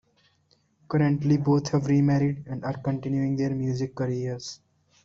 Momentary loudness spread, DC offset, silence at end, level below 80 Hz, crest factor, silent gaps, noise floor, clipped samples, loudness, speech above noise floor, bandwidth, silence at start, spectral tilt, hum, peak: 10 LU; under 0.1%; 0.5 s; -58 dBFS; 16 dB; none; -66 dBFS; under 0.1%; -26 LUFS; 42 dB; 7.6 kHz; 0.9 s; -7.5 dB/octave; none; -10 dBFS